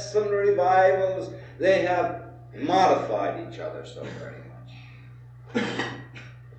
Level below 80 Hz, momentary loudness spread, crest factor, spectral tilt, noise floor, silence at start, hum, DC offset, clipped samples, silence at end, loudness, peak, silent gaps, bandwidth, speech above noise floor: -58 dBFS; 23 LU; 18 dB; -5.5 dB/octave; -45 dBFS; 0 s; none; under 0.1%; under 0.1%; 0 s; -24 LUFS; -8 dBFS; none; 8.6 kHz; 21 dB